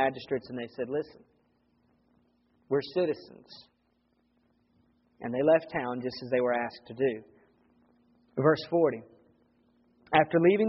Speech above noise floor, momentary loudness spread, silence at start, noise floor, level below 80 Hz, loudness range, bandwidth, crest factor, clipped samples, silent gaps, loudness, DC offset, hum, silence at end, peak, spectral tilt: 44 dB; 17 LU; 0 s; -72 dBFS; -70 dBFS; 6 LU; 5.8 kHz; 24 dB; under 0.1%; none; -29 LUFS; under 0.1%; none; 0 s; -6 dBFS; -5 dB/octave